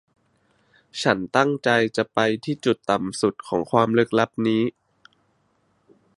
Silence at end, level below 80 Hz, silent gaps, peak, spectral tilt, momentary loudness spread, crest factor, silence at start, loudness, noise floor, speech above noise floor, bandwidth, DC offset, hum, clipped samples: 1.5 s; -62 dBFS; none; -2 dBFS; -5.5 dB/octave; 5 LU; 22 dB; 0.95 s; -22 LUFS; -66 dBFS; 45 dB; 11.5 kHz; under 0.1%; none; under 0.1%